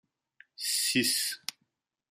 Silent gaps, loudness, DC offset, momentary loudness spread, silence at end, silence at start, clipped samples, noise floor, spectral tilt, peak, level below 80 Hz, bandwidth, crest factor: none; -28 LUFS; under 0.1%; 13 LU; 0.6 s; 0.6 s; under 0.1%; -79 dBFS; -1 dB/octave; -10 dBFS; -80 dBFS; 15.5 kHz; 22 dB